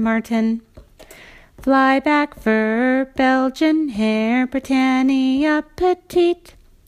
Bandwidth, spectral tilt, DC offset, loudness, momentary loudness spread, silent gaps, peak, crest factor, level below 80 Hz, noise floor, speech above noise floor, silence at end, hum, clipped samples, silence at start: 14.5 kHz; -5.5 dB/octave; under 0.1%; -18 LUFS; 4 LU; none; -4 dBFS; 14 dB; -48 dBFS; -44 dBFS; 26 dB; 0.55 s; none; under 0.1%; 0 s